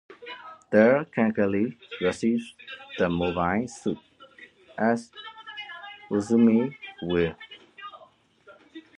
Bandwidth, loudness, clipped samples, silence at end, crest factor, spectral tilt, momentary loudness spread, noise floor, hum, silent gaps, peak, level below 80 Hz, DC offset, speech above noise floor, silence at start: 10.5 kHz; -25 LUFS; under 0.1%; 0.2 s; 22 dB; -6.5 dB/octave; 22 LU; -56 dBFS; none; none; -4 dBFS; -56 dBFS; under 0.1%; 32 dB; 0.1 s